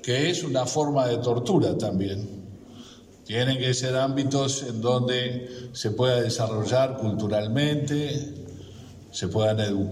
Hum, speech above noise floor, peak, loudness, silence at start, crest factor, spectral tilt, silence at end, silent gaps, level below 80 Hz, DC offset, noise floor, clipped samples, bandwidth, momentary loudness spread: none; 22 dB; -10 dBFS; -25 LUFS; 0 s; 16 dB; -5 dB/octave; 0 s; none; -60 dBFS; under 0.1%; -47 dBFS; under 0.1%; 13.5 kHz; 17 LU